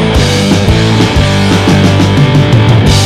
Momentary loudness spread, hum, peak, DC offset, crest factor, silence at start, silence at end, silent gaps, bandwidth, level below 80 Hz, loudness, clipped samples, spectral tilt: 2 LU; none; 0 dBFS; under 0.1%; 6 dB; 0 s; 0 s; none; 14.5 kHz; -20 dBFS; -7 LUFS; under 0.1%; -5.5 dB/octave